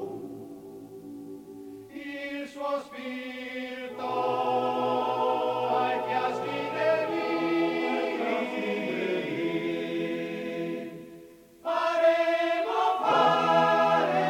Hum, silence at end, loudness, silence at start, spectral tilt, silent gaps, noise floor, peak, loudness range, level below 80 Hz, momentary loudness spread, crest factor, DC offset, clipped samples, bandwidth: none; 0 s; -27 LUFS; 0 s; -5.5 dB/octave; none; -50 dBFS; -10 dBFS; 10 LU; -72 dBFS; 20 LU; 18 dB; under 0.1%; under 0.1%; 16.5 kHz